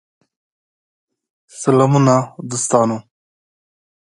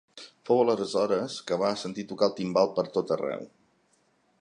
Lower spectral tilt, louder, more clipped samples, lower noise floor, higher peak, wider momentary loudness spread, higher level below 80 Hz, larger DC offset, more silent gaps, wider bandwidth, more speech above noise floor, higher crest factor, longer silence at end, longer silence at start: about the same, -6 dB/octave vs -5.5 dB/octave; first, -16 LUFS vs -27 LUFS; neither; first, under -90 dBFS vs -68 dBFS; first, 0 dBFS vs -8 dBFS; about the same, 11 LU vs 13 LU; first, -62 dBFS vs -72 dBFS; neither; neither; about the same, 11.5 kHz vs 10.5 kHz; first, over 75 dB vs 41 dB; about the same, 18 dB vs 20 dB; first, 1.15 s vs 0.95 s; first, 1.55 s vs 0.15 s